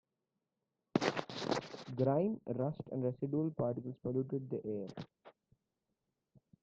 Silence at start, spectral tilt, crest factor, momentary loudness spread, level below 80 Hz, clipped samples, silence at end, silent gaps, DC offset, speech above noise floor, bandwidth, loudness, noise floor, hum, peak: 0.95 s; -7 dB/octave; 24 dB; 9 LU; -74 dBFS; under 0.1%; 1.3 s; none; under 0.1%; 51 dB; 8.6 kHz; -38 LUFS; -88 dBFS; none; -16 dBFS